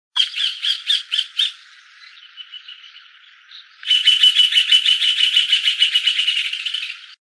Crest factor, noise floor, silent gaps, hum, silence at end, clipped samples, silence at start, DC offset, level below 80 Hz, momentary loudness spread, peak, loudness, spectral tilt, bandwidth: 18 dB; -47 dBFS; none; none; 0.15 s; under 0.1%; 0.15 s; under 0.1%; under -90 dBFS; 19 LU; -2 dBFS; -14 LUFS; 10.5 dB/octave; 11 kHz